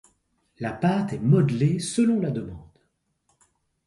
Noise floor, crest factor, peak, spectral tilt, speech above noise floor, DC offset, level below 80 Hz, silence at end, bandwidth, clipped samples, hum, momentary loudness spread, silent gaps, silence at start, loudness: -72 dBFS; 18 dB; -8 dBFS; -7 dB/octave; 49 dB; under 0.1%; -56 dBFS; 1.25 s; 11.5 kHz; under 0.1%; none; 13 LU; none; 0.6 s; -24 LUFS